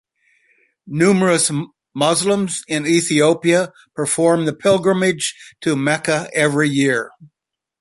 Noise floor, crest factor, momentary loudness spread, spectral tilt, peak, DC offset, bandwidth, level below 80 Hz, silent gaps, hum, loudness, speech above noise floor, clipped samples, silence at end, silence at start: -60 dBFS; 16 dB; 10 LU; -4 dB/octave; -2 dBFS; under 0.1%; 11.5 kHz; -60 dBFS; none; none; -17 LUFS; 43 dB; under 0.1%; 0.55 s; 0.85 s